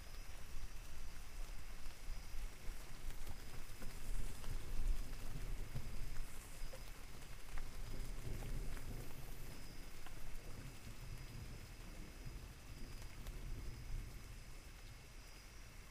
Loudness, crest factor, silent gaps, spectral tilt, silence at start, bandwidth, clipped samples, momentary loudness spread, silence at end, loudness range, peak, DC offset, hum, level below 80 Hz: -53 LUFS; 16 dB; none; -4 dB/octave; 0 s; 15.5 kHz; under 0.1%; 6 LU; 0 s; 4 LU; -26 dBFS; under 0.1%; none; -46 dBFS